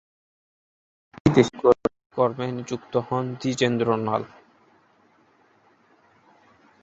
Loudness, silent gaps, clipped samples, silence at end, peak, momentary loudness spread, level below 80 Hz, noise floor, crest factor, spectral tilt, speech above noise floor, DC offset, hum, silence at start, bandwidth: -23 LUFS; 2.06-2.10 s; under 0.1%; 2.55 s; -2 dBFS; 10 LU; -56 dBFS; -60 dBFS; 24 dB; -6.5 dB/octave; 38 dB; under 0.1%; none; 1.25 s; 8 kHz